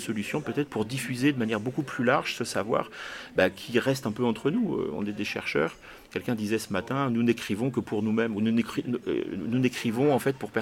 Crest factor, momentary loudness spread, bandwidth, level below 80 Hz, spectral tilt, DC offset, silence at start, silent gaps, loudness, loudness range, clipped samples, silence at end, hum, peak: 22 dB; 6 LU; 16.5 kHz; -62 dBFS; -5.5 dB/octave; under 0.1%; 0 s; none; -28 LUFS; 2 LU; under 0.1%; 0 s; none; -6 dBFS